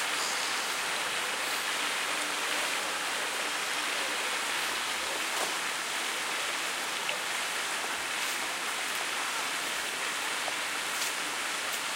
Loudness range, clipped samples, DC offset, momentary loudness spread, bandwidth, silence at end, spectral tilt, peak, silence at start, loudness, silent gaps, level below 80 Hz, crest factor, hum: 1 LU; under 0.1%; under 0.1%; 2 LU; 16 kHz; 0 s; 1 dB/octave; -16 dBFS; 0 s; -30 LUFS; none; -74 dBFS; 16 dB; none